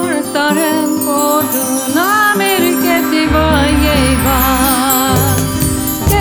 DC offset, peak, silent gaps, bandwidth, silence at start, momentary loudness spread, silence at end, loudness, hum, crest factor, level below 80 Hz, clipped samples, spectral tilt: under 0.1%; -2 dBFS; none; over 20 kHz; 0 s; 4 LU; 0 s; -12 LUFS; none; 10 dB; -24 dBFS; under 0.1%; -4 dB/octave